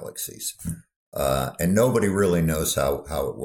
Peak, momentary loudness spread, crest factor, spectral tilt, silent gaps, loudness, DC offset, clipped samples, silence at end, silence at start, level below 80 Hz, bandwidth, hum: -6 dBFS; 14 LU; 16 dB; -5 dB/octave; 0.96-1.12 s; -23 LUFS; under 0.1%; under 0.1%; 0 s; 0 s; -42 dBFS; 18 kHz; none